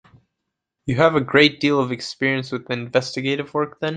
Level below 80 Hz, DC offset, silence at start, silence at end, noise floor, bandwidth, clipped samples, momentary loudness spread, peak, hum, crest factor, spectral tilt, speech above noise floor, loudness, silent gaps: -56 dBFS; under 0.1%; 0.85 s; 0 s; -80 dBFS; 9.4 kHz; under 0.1%; 11 LU; -2 dBFS; none; 20 dB; -5.5 dB/octave; 60 dB; -20 LUFS; none